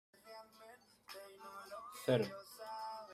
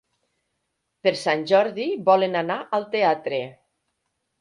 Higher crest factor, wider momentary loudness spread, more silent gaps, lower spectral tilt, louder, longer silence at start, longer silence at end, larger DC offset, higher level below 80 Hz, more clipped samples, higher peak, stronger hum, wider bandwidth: about the same, 24 dB vs 20 dB; first, 23 LU vs 8 LU; neither; about the same, -5.5 dB/octave vs -5 dB/octave; second, -43 LUFS vs -22 LUFS; second, 0.15 s vs 1.05 s; second, 0 s vs 0.9 s; neither; second, -82 dBFS vs -74 dBFS; neither; second, -20 dBFS vs -4 dBFS; neither; first, 16 kHz vs 11 kHz